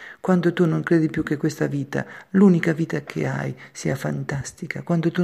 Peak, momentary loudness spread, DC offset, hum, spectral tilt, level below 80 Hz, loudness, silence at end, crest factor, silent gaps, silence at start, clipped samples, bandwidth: -4 dBFS; 12 LU; under 0.1%; none; -7 dB/octave; -54 dBFS; -23 LUFS; 0 s; 16 dB; none; 0 s; under 0.1%; 13.5 kHz